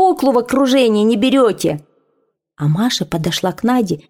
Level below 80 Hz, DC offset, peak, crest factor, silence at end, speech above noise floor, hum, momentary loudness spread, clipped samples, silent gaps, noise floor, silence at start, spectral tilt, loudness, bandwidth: -50 dBFS; under 0.1%; -2 dBFS; 14 dB; 0.1 s; 51 dB; none; 7 LU; under 0.1%; none; -65 dBFS; 0 s; -5.5 dB/octave; -15 LUFS; 17 kHz